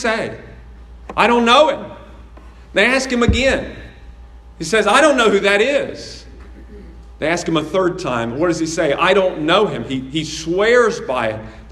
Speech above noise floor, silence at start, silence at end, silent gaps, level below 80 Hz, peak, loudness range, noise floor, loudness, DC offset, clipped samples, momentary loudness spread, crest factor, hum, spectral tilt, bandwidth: 23 dB; 0 s; 0 s; none; -36 dBFS; 0 dBFS; 3 LU; -39 dBFS; -16 LUFS; under 0.1%; under 0.1%; 16 LU; 18 dB; none; -4 dB/octave; 12.5 kHz